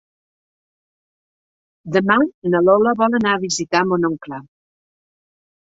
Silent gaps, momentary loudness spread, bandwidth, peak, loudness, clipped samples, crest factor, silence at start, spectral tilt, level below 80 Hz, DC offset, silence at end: 2.34-2.42 s; 10 LU; 8 kHz; -2 dBFS; -17 LUFS; under 0.1%; 18 dB; 1.85 s; -5 dB/octave; -60 dBFS; under 0.1%; 1.25 s